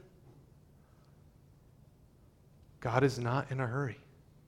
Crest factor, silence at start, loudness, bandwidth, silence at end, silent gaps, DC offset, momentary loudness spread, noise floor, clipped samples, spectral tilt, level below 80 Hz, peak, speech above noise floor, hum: 24 dB; 0.25 s; -34 LUFS; 13 kHz; 0.5 s; none; under 0.1%; 11 LU; -62 dBFS; under 0.1%; -7 dB/octave; -64 dBFS; -14 dBFS; 30 dB; none